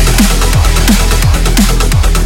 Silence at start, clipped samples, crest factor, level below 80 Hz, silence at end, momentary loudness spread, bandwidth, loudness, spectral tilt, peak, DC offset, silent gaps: 0 s; 0.2%; 8 dB; -10 dBFS; 0 s; 1 LU; 17 kHz; -10 LUFS; -4 dB/octave; 0 dBFS; under 0.1%; none